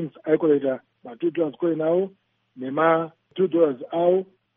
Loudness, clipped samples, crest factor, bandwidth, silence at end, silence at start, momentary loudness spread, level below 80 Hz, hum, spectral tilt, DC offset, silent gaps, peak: -23 LUFS; under 0.1%; 18 dB; 3.7 kHz; 0.35 s; 0 s; 10 LU; -76 dBFS; none; -6 dB/octave; under 0.1%; none; -6 dBFS